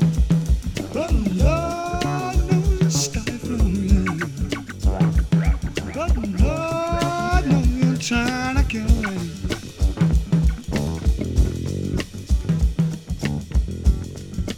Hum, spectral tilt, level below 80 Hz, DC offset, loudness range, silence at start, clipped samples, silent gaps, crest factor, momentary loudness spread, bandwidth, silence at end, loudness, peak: none; -6 dB/octave; -24 dBFS; under 0.1%; 2 LU; 0 s; under 0.1%; none; 16 dB; 7 LU; 14.5 kHz; 0 s; -22 LUFS; -4 dBFS